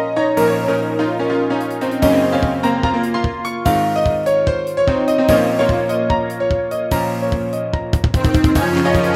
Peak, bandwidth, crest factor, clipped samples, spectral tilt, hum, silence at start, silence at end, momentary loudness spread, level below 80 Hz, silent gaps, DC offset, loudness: 0 dBFS; 16.5 kHz; 16 dB; under 0.1%; -6.5 dB/octave; none; 0 s; 0 s; 6 LU; -28 dBFS; none; under 0.1%; -17 LUFS